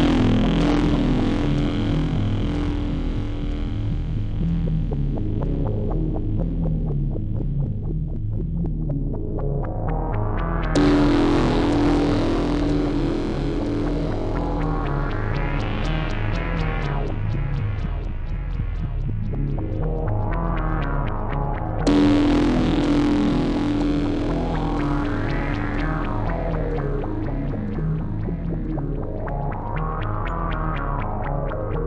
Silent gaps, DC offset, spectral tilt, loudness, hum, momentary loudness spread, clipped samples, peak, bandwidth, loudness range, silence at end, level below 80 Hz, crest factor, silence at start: none; under 0.1%; -8 dB/octave; -24 LUFS; none; 8 LU; under 0.1%; -6 dBFS; 9 kHz; 6 LU; 0 s; -26 dBFS; 16 dB; 0 s